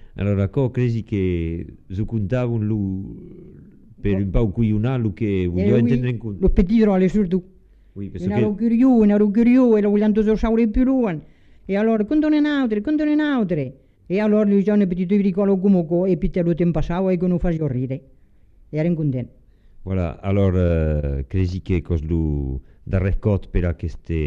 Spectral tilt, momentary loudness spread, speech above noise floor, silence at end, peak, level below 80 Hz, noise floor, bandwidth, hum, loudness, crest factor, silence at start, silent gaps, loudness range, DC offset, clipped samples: -10 dB/octave; 11 LU; 31 dB; 0 s; -2 dBFS; -32 dBFS; -50 dBFS; 7 kHz; none; -20 LUFS; 16 dB; 0.05 s; none; 6 LU; under 0.1%; under 0.1%